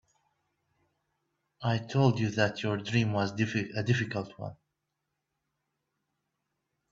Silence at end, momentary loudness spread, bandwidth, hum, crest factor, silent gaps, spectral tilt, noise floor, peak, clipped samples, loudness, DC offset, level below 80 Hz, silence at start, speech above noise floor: 2.35 s; 10 LU; 7.6 kHz; none; 22 dB; none; -6.5 dB/octave; -84 dBFS; -10 dBFS; under 0.1%; -30 LUFS; under 0.1%; -66 dBFS; 1.6 s; 55 dB